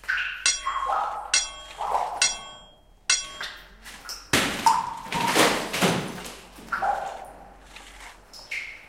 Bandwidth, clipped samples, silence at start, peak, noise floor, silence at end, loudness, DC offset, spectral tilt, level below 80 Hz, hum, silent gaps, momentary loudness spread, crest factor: 16 kHz; under 0.1%; 0.05 s; -4 dBFS; -53 dBFS; 0 s; -25 LUFS; under 0.1%; -1.5 dB/octave; -52 dBFS; none; none; 21 LU; 24 dB